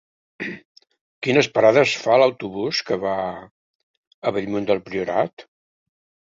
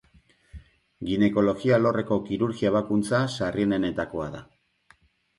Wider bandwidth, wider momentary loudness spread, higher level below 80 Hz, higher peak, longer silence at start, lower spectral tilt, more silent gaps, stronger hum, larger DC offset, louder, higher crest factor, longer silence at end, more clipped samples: second, 7.8 kHz vs 11.5 kHz; first, 16 LU vs 11 LU; second, -62 dBFS vs -54 dBFS; first, -2 dBFS vs -10 dBFS; second, 0.4 s vs 0.55 s; second, -5 dB/octave vs -7 dB/octave; first, 0.65-0.75 s, 1.01-1.21 s, 3.51-4.22 s, 5.33-5.37 s vs none; neither; neither; first, -20 LUFS vs -25 LUFS; about the same, 20 dB vs 16 dB; about the same, 0.9 s vs 0.95 s; neither